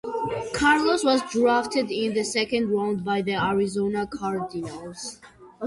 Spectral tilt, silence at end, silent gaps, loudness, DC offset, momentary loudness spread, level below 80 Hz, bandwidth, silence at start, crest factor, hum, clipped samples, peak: -4.5 dB/octave; 0 s; none; -24 LUFS; under 0.1%; 13 LU; -54 dBFS; 11.5 kHz; 0.05 s; 16 dB; none; under 0.1%; -8 dBFS